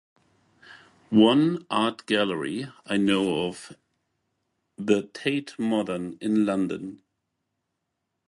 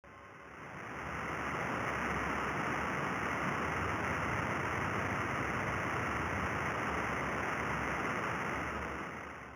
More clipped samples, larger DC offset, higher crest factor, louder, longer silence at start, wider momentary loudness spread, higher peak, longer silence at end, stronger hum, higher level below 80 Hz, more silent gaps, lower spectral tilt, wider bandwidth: neither; neither; about the same, 20 dB vs 16 dB; first, -25 LUFS vs -36 LUFS; first, 0.7 s vs 0.05 s; first, 13 LU vs 8 LU; first, -6 dBFS vs -20 dBFS; first, 1.35 s vs 0 s; neither; second, -66 dBFS vs -54 dBFS; neither; about the same, -5.5 dB/octave vs -5 dB/octave; second, 11.5 kHz vs over 20 kHz